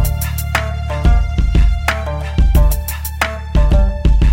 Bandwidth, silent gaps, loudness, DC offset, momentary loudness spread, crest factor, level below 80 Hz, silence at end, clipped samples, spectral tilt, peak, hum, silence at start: 17 kHz; none; -17 LUFS; under 0.1%; 6 LU; 12 dB; -14 dBFS; 0 s; under 0.1%; -5.5 dB/octave; -2 dBFS; none; 0 s